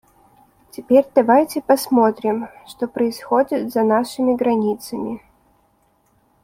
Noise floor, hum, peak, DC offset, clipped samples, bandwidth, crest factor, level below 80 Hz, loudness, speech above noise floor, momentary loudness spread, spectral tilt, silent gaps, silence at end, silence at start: -61 dBFS; none; -2 dBFS; under 0.1%; under 0.1%; 16.5 kHz; 18 dB; -60 dBFS; -18 LUFS; 43 dB; 14 LU; -5.5 dB/octave; none; 1.25 s; 0.8 s